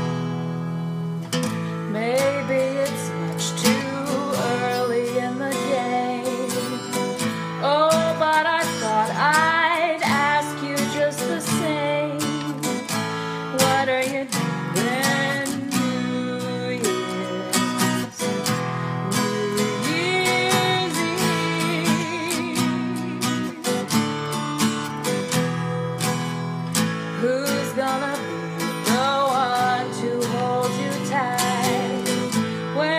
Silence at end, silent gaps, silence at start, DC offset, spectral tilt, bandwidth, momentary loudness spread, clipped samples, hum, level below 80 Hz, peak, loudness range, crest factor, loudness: 0 s; none; 0 s; under 0.1%; -4 dB/octave; 15.5 kHz; 7 LU; under 0.1%; none; -64 dBFS; -4 dBFS; 4 LU; 20 dB; -22 LUFS